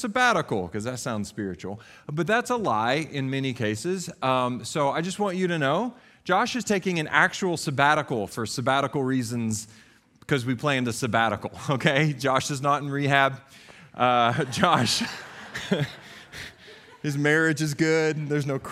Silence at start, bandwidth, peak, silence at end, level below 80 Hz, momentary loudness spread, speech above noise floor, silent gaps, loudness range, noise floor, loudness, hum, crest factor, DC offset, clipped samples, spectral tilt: 0 s; 15.5 kHz; -2 dBFS; 0 s; -62 dBFS; 13 LU; 24 dB; none; 3 LU; -49 dBFS; -25 LUFS; none; 24 dB; under 0.1%; under 0.1%; -4.5 dB/octave